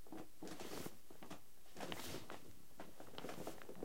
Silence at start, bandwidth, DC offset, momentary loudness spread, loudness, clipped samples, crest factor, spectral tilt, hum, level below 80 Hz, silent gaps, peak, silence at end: 0 s; 16.5 kHz; 0.4%; 10 LU; -53 LUFS; under 0.1%; 26 dB; -4 dB/octave; none; -72 dBFS; none; -28 dBFS; 0 s